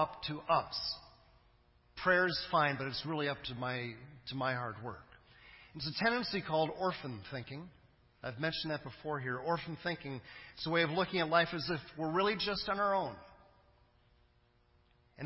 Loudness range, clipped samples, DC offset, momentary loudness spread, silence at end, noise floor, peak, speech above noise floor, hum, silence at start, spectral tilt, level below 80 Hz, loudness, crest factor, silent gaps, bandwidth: 6 LU; under 0.1%; under 0.1%; 16 LU; 0 s; -70 dBFS; -14 dBFS; 34 dB; none; 0 s; -8 dB/octave; -64 dBFS; -35 LUFS; 22 dB; none; 5.8 kHz